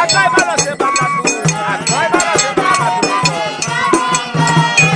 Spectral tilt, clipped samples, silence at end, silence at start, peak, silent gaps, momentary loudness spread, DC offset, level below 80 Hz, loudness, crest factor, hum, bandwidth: -3 dB/octave; under 0.1%; 0 s; 0 s; 0 dBFS; none; 5 LU; under 0.1%; -48 dBFS; -13 LUFS; 14 dB; none; 10 kHz